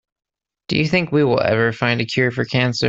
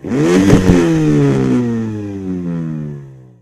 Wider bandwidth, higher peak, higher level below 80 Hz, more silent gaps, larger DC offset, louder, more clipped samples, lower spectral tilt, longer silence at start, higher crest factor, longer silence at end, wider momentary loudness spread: second, 7.8 kHz vs 14.5 kHz; about the same, -2 dBFS vs 0 dBFS; second, -52 dBFS vs -30 dBFS; neither; neither; second, -18 LUFS vs -14 LUFS; second, under 0.1% vs 0.2%; second, -6 dB/octave vs -7.5 dB/octave; first, 0.7 s vs 0.05 s; about the same, 16 dB vs 14 dB; second, 0 s vs 0.2 s; second, 3 LU vs 14 LU